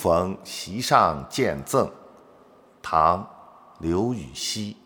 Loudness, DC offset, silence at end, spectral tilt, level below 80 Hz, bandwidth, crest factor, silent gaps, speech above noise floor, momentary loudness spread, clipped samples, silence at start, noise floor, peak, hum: -24 LUFS; under 0.1%; 0.15 s; -4.5 dB/octave; -50 dBFS; over 20 kHz; 22 dB; none; 30 dB; 13 LU; under 0.1%; 0 s; -54 dBFS; -2 dBFS; none